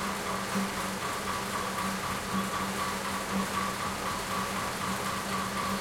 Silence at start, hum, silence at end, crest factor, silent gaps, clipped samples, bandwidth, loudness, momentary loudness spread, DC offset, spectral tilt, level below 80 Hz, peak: 0 s; none; 0 s; 14 dB; none; under 0.1%; 16.5 kHz; -32 LUFS; 1 LU; under 0.1%; -3.5 dB/octave; -54 dBFS; -18 dBFS